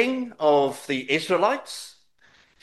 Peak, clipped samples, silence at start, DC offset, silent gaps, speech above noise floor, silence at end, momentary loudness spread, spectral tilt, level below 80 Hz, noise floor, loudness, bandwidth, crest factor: -6 dBFS; under 0.1%; 0 s; under 0.1%; none; 36 dB; 0.75 s; 16 LU; -4 dB/octave; -74 dBFS; -59 dBFS; -23 LUFS; 12.5 kHz; 18 dB